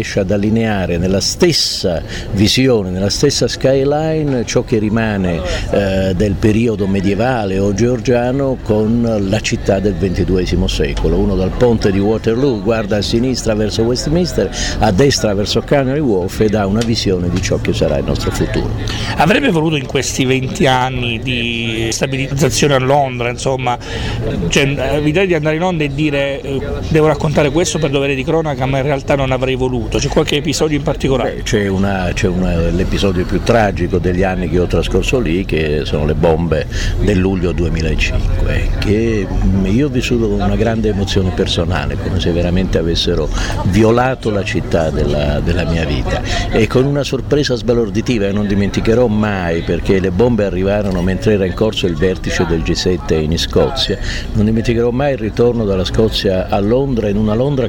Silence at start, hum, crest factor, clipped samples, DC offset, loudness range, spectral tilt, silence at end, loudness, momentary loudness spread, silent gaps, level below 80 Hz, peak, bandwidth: 0 s; none; 12 dB; under 0.1%; under 0.1%; 1 LU; -5.5 dB/octave; 0 s; -15 LUFS; 4 LU; none; -24 dBFS; -2 dBFS; 18 kHz